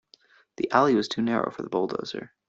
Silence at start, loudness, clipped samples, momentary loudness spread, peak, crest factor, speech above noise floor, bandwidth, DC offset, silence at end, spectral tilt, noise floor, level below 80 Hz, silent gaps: 0.6 s; -26 LUFS; under 0.1%; 12 LU; -4 dBFS; 22 dB; 33 dB; 8 kHz; under 0.1%; 0.2 s; -5.5 dB/octave; -59 dBFS; -66 dBFS; none